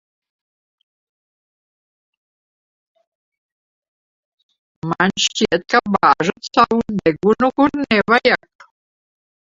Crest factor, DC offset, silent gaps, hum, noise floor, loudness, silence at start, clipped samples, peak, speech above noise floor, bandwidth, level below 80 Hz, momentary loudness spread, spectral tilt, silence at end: 20 dB; under 0.1%; none; none; under -90 dBFS; -16 LUFS; 4.85 s; under 0.1%; 0 dBFS; over 74 dB; 7.8 kHz; -54 dBFS; 5 LU; -4 dB/octave; 1.2 s